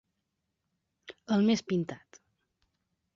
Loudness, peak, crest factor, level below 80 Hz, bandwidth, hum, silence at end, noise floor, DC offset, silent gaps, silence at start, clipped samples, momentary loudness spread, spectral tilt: -29 LUFS; -16 dBFS; 18 dB; -74 dBFS; 7.4 kHz; none; 1.2 s; -83 dBFS; under 0.1%; none; 1.1 s; under 0.1%; 23 LU; -6 dB/octave